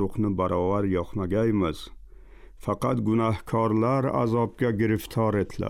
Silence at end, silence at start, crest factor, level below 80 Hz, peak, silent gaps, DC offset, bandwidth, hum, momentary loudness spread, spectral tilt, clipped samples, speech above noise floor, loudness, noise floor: 0 s; 0 s; 12 dB; -48 dBFS; -12 dBFS; none; under 0.1%; 15.5 kHz; none; 5 LU; -8 dB/octave; under 0.1%; 22 dB; -25 LUFS; -46 dBFS